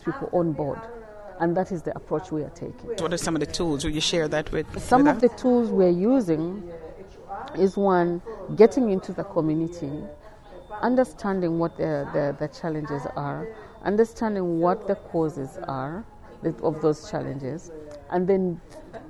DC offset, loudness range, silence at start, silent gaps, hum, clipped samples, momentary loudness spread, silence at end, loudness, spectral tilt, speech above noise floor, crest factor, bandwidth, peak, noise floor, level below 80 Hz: under 0.1%; 6 LU; 0 s; none; none; under 0.1%; 17 LU; 0 s; -25 LUFS; -6 dB/octave; 20 dB; 22 dB; 12.5 kHz; -4 dBFS; -45 dBFS; -48 dBFS